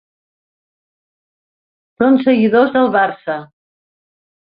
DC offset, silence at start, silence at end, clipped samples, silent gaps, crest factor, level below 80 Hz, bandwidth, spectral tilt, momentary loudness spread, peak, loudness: under 0.1%; 2 s; 1 s; under 0.1%; none; 16 dB; -60 dBFS; 5 kHz; -10 dB/octave; 12 LU; -2 dBFS; -14 LUFS